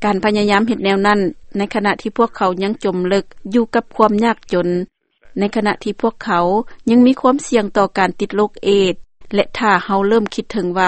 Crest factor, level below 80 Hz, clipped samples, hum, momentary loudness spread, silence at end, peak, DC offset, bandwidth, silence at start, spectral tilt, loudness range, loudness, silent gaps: 16 dB; -46 dBFS; under 0.1%; none; 7 LU; 0 s; 0 dBFS; under 0.1%; 8.8 kHz; 0 s; -5.5 dB/octave; 2 LU; -16 LUFS; none